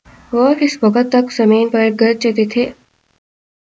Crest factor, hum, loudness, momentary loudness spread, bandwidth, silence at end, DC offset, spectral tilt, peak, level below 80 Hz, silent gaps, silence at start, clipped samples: 14 dB; none; -14 LUFS; 5 LU; 7.8 kHz; 1.05 s; under 0.1%; -5.5 dB/octave; 0 dBFS; -56 dBFS; none; 0.3 s; under 0.1%